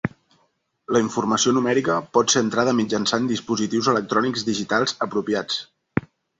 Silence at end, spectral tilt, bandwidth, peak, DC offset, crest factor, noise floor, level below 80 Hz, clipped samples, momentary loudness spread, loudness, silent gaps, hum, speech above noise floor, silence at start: 0.4 s; -4 dB/octave; 8.2 kHz; -4 dBFS; under 0.1%; 20 dB; -68 dBFS; -58 dBFS; under 0.1%; 9 LU; -22 LUFS; none; none; 46 dB; 0.05 s